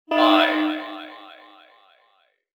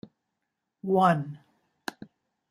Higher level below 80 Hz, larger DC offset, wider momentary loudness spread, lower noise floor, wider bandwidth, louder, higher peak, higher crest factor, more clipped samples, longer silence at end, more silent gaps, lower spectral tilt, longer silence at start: about the same, -76 dBFS vs -72 dBFS; neither; first, 23 LU vs 18 LU; second, -64 dBFS vs -83 dBFS; first, over 20 kHz vs 15 kHz; first, -19 LUFS vs -25 LUFS; first, -4 dBFS vs -8 dBFS; about the same, 20 dB vs 22 dB; neither; first, 1.3 s vs 1.15 s; neither; second, -3 dB/octave vs -7 dB/octave; second, 0.1 s vs 0.85 s